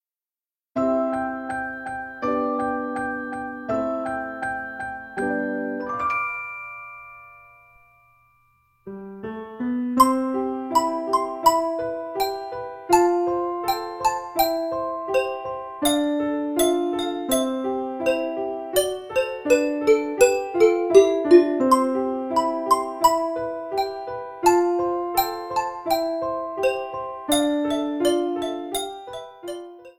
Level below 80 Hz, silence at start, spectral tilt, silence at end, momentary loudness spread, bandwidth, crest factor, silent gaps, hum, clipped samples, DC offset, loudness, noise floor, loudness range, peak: -56 dBFS; 0.75 s; -3.5 dB/octave; 0.05 s; 13 LU; 16.5 kHz; 22 dB; none; none; under 0.1%; under 0.1%; -23 LUFS; under -90 dBFS; 9 LU; -2 dBFS